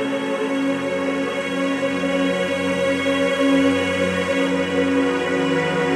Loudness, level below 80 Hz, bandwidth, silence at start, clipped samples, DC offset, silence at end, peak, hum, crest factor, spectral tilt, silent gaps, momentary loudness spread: -20 LUFS; -58 dBFS; 12.5 kHz; 0 s; under 0.1%; under 0.1%; 0 s; -6 dBFS; none; 14 dB; -5 dB/octave; none; 5 LU